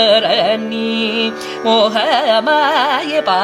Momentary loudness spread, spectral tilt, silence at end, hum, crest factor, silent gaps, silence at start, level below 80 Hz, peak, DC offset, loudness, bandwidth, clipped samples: 6 LU; -3.5 dB/octave; 0 s; none; 14 dB; none; 0 s; -64 dBFS; 0 dBFS; under 0.1%; -14 LUFS; 14.5 kHz; under 0.1%